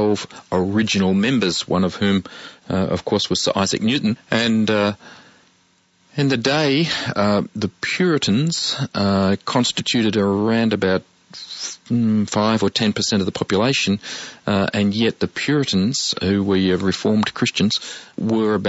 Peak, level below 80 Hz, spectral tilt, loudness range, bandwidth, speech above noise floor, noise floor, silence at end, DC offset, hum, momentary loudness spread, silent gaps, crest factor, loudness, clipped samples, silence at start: -4 dBFS; -54 dBFS; -5 dB/octave; 2 LU; 8 kHz; 40 dB; -59 dBFS; 0 s; under 0.1%; none; 7 LU; none; 16 dB; -19 LUFS; under 0.1%; 0 s